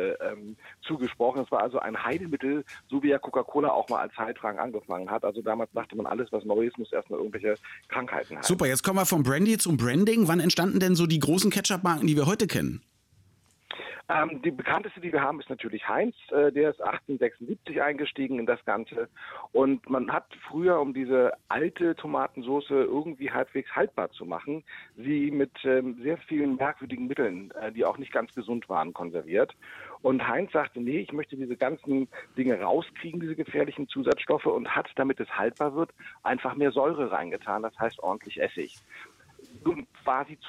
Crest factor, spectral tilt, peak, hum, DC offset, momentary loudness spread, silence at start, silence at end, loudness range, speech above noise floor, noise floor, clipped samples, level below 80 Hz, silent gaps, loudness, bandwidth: 16 dB; -5 dB/octave; -12 dBFS; none; under 0.1%; 11 LU; 0 s; 0 s; 6 LU; 35 dB; -63 dBFS; under 0.1%; -64 dBFS; none; -28 LUFS; 16.5 kHz